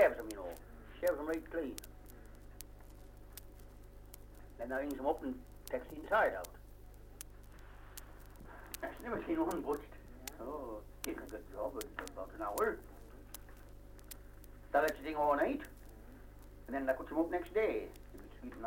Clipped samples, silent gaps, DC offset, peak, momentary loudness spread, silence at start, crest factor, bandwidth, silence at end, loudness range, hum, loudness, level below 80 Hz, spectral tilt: under 0.1%; none; under 0.1%; -16 dBFS; 23 LU; 0 s; 24 dB; 16.5 kHz; 0 s; 7 LU; 50 Hz at -55 dBFS; -39 LUFS; -56 dBFS; -5 dB/octave